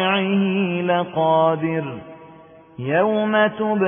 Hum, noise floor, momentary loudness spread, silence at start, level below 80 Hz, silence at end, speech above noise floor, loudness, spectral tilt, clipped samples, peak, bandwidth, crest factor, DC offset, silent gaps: none; -45 dBFS; 10 LU; 0 s; -64 dBFS; 0 s; 26 dB; -19 LUFS; -11.5 dB/octave; under 0.1%; -6 dBFS; 3.6 kHz; 14 dB; under 0.1%; none